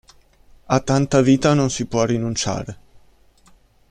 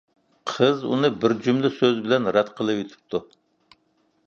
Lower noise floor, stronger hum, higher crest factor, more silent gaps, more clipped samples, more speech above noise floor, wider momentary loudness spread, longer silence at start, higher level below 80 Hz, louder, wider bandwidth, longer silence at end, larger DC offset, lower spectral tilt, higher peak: second, -53 dBFS vs -67 dBFS; neither; about the same, 20 dB vs 20 dB; neither; neither; second, 35 dB vs 45 dB; about the same, 9 LU vs 11 LU; first, 0.7 s vs 0.45 s; first, -46 dBFS vs -66 dBFS; first, -19 LUFS vs -23 LUFS; first, 10.5 kHz vs 7.4 kHz; about the same, 1.15 s vs 1.05 s; neither; about the same, -5.5 dB/octave vs -6 dB/octave; about the same, -2 dBFS vs -4 dBFS